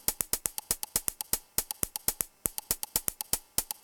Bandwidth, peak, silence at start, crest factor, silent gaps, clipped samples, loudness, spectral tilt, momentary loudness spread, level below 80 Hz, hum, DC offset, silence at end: 18 kHz; -2 dBFS; 0.1 s; 32 dB; none; under 0.1%; -31 LUFS; -0.5 dB/octave; 3 LU; -54 dBFS; none; under 0.1%; 0.1 s